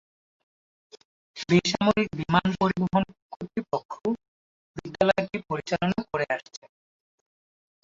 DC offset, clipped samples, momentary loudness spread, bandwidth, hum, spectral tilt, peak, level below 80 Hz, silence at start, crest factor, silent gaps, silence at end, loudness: under 0.1%; under 0.1%; 18 LU; 7.8 kHz; none; -6 dB/octave; -6 dBFS; -58 dBFS; 1.35 s; 22 dB; 3.22-3.30 s, 3.85-3.89 s, 4.28-4.74 s; 1.25 s; -26 LUFS